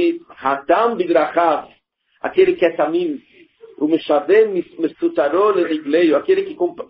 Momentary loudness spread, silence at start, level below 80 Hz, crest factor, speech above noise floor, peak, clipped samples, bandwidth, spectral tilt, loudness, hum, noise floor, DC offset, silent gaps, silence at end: 9 LU; 0 s; -62 dBFS; 16 dB; 44 dB; -2 dBFS; under 0.1%; 5.4 kHz; -3.5 dB/octave; -17 LUFS; none; -60 dBFS; under 0.1%; none; 0.05 s